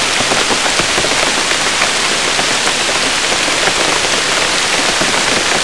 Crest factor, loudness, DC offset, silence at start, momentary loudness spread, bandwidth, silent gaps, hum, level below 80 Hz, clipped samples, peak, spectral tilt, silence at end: 14 dB; -11 LUFS; 2%; 0 s; 1 LU; 12 kHz; none; none; -40 dBFS; under 0.1%; 0 dBFS; -0.5 dB/octave; 0 s